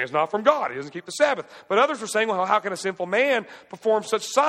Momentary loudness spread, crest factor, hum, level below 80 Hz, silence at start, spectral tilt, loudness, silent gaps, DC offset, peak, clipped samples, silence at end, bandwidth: 9 LU; 20 dB; none; -76 dBFS; 0 s; -3 dB/octave; -23 LUFS; none; under 0.1%; -4 dBFS; under 0.1%; 0 s; 15 kHz